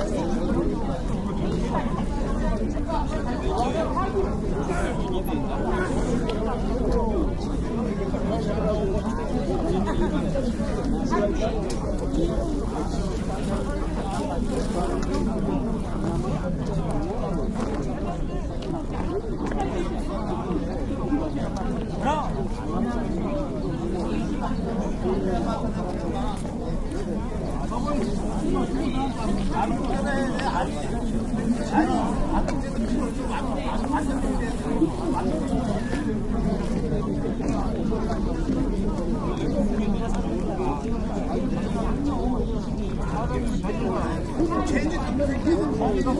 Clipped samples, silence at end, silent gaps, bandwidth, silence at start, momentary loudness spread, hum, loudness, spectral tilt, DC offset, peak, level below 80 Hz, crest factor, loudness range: under 0.1%; 0 s; none; 12 kHz; 0 s; 4 LU; none; -27 LUFS; -7 dB/octave; under 0.1%; -8 dBFS; -30 dBFS; 16 dB; 3 LU